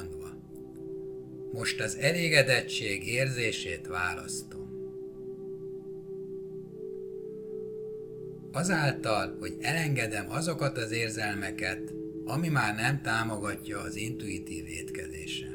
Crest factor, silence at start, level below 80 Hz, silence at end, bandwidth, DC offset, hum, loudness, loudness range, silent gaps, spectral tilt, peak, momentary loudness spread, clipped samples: 26 dB; 0 s; -58 dBFS; 0 s; 18.5 kHz; under 0.1%; none; -32 LUFS; 12 LU; none; -4.5 dB/octave; -6 dBFS; 14 LU; under 0.1%